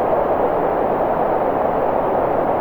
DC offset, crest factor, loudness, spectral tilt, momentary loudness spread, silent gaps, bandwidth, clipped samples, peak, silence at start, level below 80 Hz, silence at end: under 0.1%; 12 dB; -18 LUFS; -9 dB/octave; 1 LU; none; 19 kHz; under 0.1%; -4 dBFS; 0 s; -40 dBFS; 0 s